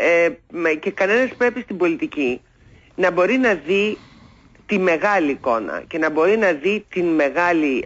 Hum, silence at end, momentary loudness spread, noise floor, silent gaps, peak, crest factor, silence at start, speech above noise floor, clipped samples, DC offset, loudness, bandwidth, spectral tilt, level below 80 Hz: none; 0 s; 7 LU; -49 dBFS; none; -6 dBFS; 12 dB; 0 s; 30 dB; under 0.1%; under 0.1%; -19 LUFS; 7.8 kHz; -5.5 dB/octave; -56 dBFS